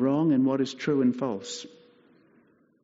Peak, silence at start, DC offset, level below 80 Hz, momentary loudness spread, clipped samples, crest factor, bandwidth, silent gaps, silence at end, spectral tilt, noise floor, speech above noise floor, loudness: -14 dBFS; 0 s; under 0.1%; -72 dBFS; 15 LU; under 0.1%; 14 dB; 7.8 kHz; none; 1.15 s; -6 dB/octave; -63 dBFS; 37 dB; -26 LUFS